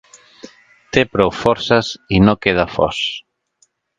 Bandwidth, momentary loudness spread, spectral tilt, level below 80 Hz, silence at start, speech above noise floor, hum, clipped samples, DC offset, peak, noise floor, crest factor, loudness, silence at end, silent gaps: 9.2 kHz; 7 LU; -5.5 dB/octave; -38 dBFS; 0.45 s; 45 dB; none; under 0.1%; under 0.1%; 0 dBFS; -61 dBFS; 18 dB; -16 LUFS; 0.8 s; none